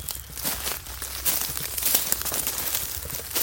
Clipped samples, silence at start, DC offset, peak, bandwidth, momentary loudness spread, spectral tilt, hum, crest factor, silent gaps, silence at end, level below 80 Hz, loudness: under 0.1%; 0 s; under 0.1%; 0 dBFS; 17 kHz; 9 LU; -0.5 dB/octave; none; 28 dB; none; 0 s; -44 dBFS; -25 LUFS